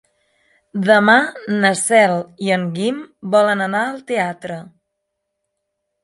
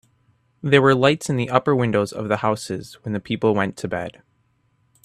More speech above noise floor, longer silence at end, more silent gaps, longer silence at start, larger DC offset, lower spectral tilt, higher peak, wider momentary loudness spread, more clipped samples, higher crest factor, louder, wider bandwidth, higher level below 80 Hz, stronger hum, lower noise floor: first, 59 dB vs 45 dB; first, 1.4 s vs 0.95 s; neither; about the same, 0.75 s vs 0.65 s; neither; second, -4.5 dB/octave vs -6 dB/octave; about the same, 0 dBFS vs 0 dBFS; about the same, 15 LU vs 14 LU; neither; about the same, 18 dB vs 22 dB; first, -16 LUFS vs -21 LUFS; second, 11.5 kHz vs 13.5 kHz; second, -68 dBFS vs -58 dBFS; neither; first, -76 dBFS vs -65 dBFS